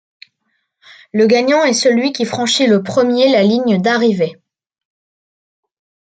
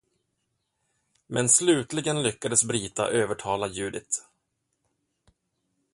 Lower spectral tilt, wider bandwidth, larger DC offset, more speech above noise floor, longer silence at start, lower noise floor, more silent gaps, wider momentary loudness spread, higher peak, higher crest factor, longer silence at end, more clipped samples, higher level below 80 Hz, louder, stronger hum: first, -4.5 dB/octave vs -3 dB/octave; second, 9.4 kHz vs 11.5 kHz; neither; about the same, 55 dB vs 52 dB; second, 1.15 s vs 1.3 s; second, -68 dBFS vs -78 dBFS; neither; second, 6 LU vs 12 LU; first, -2 dBFS vs -6 dBFS; second, 14 dB vs 22 dB; about the same, 1.85 s vs 1.75 s; neither; about the same, -64 dBFS vs -62 dBFS; first, -13 LUFS vs -25 LUFS; neither